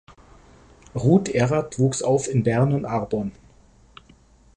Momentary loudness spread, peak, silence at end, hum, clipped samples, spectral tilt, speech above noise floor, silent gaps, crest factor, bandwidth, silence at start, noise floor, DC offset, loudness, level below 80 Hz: 9 LU; -4 dBFS; 1.25 s; none; under 0.1%; -6.5 dB/octave; 33 dB; none; 18 dB; 10.5 kHz; 0.95 s; -53 dBFS; under 0.1%; -22 LUFS; -50 dBFS